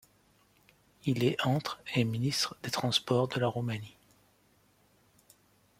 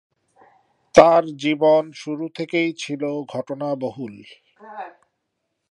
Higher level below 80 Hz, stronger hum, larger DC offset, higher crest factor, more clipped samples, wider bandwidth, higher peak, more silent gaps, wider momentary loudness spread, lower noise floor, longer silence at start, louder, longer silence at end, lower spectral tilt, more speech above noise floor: second, -68 dBFS vs -58 dBFS; first, 50 Hz at -65 dBFS vs none; neither; about the same, 20 dB vs 22 dB; neither; first, 16 kHz vs 11 kHz; second, -14 dBFS vs 0 dBFS; neither; second, 9 LU vs 23 LU; second, -67 dBFS vs -76 dBFS; about the same, 1.05 s vs 0.95 s; second, -31 LUFS vs -20 LUFS; first, 1.9 s vs 0.8 s; about the same, -5 dB/octave vs -5.5 dB/octave; second, 37 dB vs 56 dB